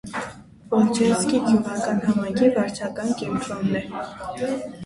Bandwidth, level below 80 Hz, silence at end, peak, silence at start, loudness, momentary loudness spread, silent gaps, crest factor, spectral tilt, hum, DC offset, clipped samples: 11.5 kHz; -54 dBFS; 0 s; -6 dBFS; 0.05 s; -23 LUFS; 13 LU; none; 16 dB; -5.5 dB/octave; none; under 0.1%; under 0.1%